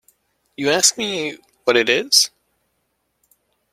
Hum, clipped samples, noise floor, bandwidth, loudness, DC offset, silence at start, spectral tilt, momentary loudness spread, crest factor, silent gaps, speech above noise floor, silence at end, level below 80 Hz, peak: none; under 0.1%; -71 dBFS; 16 kHz; -17 LUFS; under 0.1%; 0.6 s; -1 dB/octave; 11 LU; 22 dB; none; 53 dB; 1.45 s; -66 dBFS; 0 dBFS